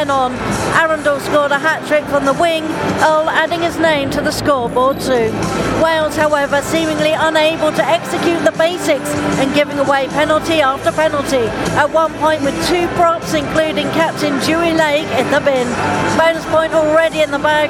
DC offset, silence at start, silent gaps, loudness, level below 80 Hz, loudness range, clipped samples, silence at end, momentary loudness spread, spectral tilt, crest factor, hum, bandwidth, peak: under 0.1%; 0 s; none; -14 LUFS; -40 dBFS; 1 LU; under 0.1%; 0 s; 3 LU; -4.5 dB/octave; 14 dB; none; 17 kHz; 0 dBFS